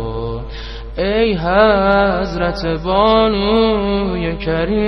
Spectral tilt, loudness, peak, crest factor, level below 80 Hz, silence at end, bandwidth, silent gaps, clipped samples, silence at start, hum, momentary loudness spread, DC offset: -7.5 dB/octave; -15 LUFS; 0 dBFS; 16 dB; -28 dBFS; 0 s; 6.2 kHz; none; under 0.1%; 0 s; none; 13 LU; under 0.1%